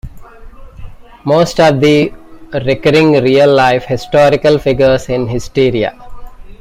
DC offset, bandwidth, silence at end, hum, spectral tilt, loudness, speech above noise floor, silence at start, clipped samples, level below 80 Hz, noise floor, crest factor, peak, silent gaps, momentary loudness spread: under 0.1%; 15.5 kHz; 0.05 s; none; -6 dB/octave; -11 LUFS; 22 dB; 0.05 s; under 0.1%; -34 dBFS; -32 dBFS; 12 dB; 0 dBFS; none; 9 LU